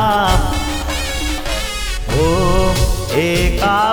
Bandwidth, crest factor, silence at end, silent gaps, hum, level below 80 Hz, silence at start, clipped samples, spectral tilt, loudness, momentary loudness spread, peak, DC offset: over 20 kHz; 14 dB; 0 s; none; none; -20 dBFS; 0 s; under 0.1%; -4.5 dB/octave; -17 LUFS; 6 LU; -2 dBFS; under 0.1%